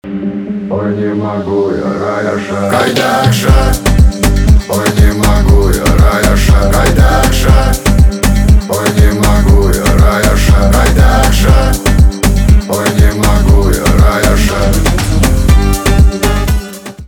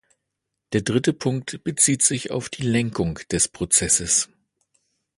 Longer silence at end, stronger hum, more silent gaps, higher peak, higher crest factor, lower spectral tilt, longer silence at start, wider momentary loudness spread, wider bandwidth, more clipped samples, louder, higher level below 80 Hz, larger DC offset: second, 0 s vs 0.95 s; neither; neither; about the same, 0 dBFS vs -2 dBFS; second, 8 dB vs 22 dB; first, -5.5 dB/octave vs -3.5 dB/octave; second, 0.05 s vs 0.7 s; second, 6 LU vs 10 LU; first, 20 kHz vs 12 kHz; first, 0.3% vs under 0.1%; first, -10 LUFS vs -21 LUFS; first, -10 dBFS vs -48 dBFS; first, 0.4% vs under 0.1%